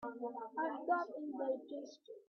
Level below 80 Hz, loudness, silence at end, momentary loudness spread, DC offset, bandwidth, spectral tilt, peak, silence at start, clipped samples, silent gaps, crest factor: -88 dBFS; -41 LUFS; 0.05 s; 12 LU; under 0.1%; 6.6 kHz; -2.5 dB/octave; -24 dBFS; 0 s; under 0.1%; none; 18 dB